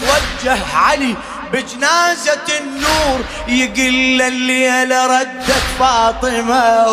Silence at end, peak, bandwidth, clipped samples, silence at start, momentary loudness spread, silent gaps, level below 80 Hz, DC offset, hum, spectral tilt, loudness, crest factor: 0 s; 0 dBFS; 15.5 kHz; under 0.1%; 0 s; 6 LU; none; -32 dBFS; under 0.1%; none; -2.5 dB/octave; -14 LUFS; 14 dB